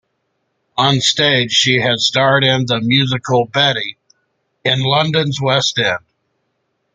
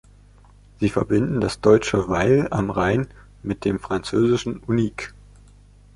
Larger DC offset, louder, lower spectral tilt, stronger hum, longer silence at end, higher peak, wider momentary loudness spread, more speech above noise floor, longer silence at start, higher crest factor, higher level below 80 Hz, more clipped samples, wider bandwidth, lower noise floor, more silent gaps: neither; first, -14 LUFS vs -21 LUFS; second, -4 dB/octave vs -6.5 dB/octave; second, none vs 50 Hz at -40 dBFS; about the same, 0.95 s vs 0.85 s; about the same, 0 dBFS vs -2 dBFS; second, 6 LU vs 11 LU; first, 54 dB vs 29 dB; about the same, 0.75 s vs 0.8 s; about the same, 16 dB vs 20 dB; second, -54 dBFS vs -44 dBFS; neither; second, 9.4 kHz vs 11.5 kHz; first, -69 dBFS vs -49 dBFS; neither